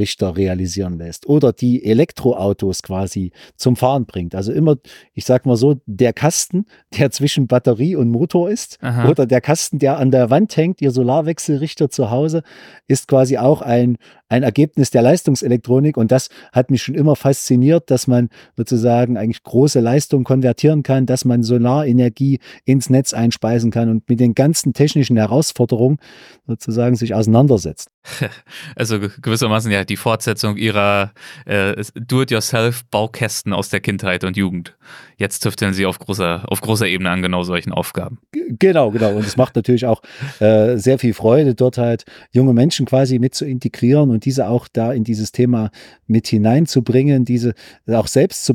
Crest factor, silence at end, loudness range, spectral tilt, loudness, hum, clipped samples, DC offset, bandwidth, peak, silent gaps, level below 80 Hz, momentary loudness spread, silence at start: 16 dB; 0 s; 4 LU; -6 dB/octave; -16 LUFS; none; under 0.1%; under 0.1%; 17 kHz; 0 dBFS; 27.94-28.02 s; -50 dBFS; 9 LU; 0 s